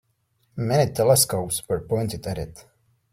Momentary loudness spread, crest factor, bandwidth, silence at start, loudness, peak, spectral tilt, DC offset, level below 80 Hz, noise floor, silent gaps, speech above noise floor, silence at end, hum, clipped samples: 15 LU; 20 dB; 16.5 kHz; 0.55 s; -23 LUFS; -4 dBFS; -4.5 dB/octave; under 0.1%; -50 dBFS; -69 dBFS; none; 46 dB; 0.5 s; none; under 0.1%